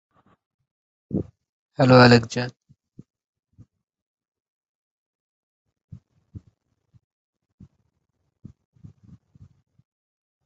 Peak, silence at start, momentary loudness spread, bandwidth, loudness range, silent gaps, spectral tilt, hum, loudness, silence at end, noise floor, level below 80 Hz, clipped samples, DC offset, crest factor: -2 dBFS; 1.1 s; 24 LU; 8 kHz; 13 LU; 1.49-1.69 s, 3.10-3.14 s, 3.26-3.33 s, 4.02-4.15 s, 4.28-4.32 s, 4.40-5.65 s, 5.84-5.88 s; -6.5 dB/octave; none; -18 LUFS; 4.05 s; -75 dBFS; -56 dBFS; under 0.1%; under 0.1%; 24 dB